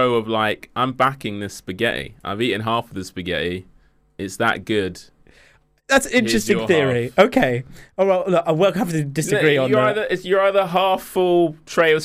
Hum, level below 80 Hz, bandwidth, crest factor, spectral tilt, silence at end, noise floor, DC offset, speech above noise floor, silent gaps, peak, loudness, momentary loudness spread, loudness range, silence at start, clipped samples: none; -50 dBFS; 16 kHz; 18 dB; -5 dB/octave; 0 s; -55 dBFS; under 0.1%; 35 dB; none; -2 dBFS; -19 LUFS; 12 LU; 6 LU; 0 s; under 0.1%